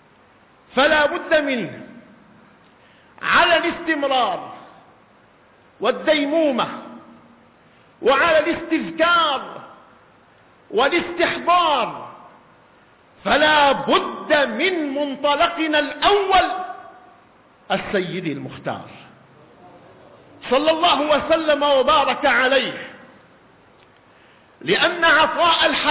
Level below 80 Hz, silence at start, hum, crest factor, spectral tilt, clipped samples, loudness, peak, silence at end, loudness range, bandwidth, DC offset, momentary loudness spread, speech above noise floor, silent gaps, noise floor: -54 dBFS; 0.75 s; none; 16 dB; -7.5 dB/octave; under 0.1%; -18 LUFS; -4 dBFS; 0 s; 6 LU; 4 kHz; under 0.1%; 15 LU; 34 dB; none; -53 dBFS